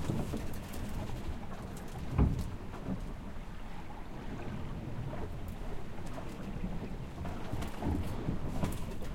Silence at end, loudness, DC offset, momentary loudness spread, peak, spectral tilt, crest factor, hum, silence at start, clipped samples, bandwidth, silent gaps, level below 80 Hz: 0 s; -40 LUFS; under 0.1%; 9 LU; -16 dBFS; -7 dB/octave; 20 dB; none; 0 s; under 0.1%; 16.5 kHz; none; -42 dBFS